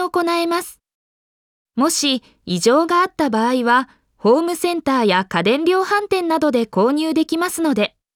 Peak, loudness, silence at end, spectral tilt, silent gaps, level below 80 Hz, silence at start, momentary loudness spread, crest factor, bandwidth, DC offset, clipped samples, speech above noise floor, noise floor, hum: -4 dBFS; -18 LUFS; 0.3 s; -4 dB/octave; 0.94-1.65 s; -60 dBFS; 0 s; 6 LU; 14 dB; 18.5 kHz; under 0.1%; under 0.1%; over 73 dB; under -90 dBFS; none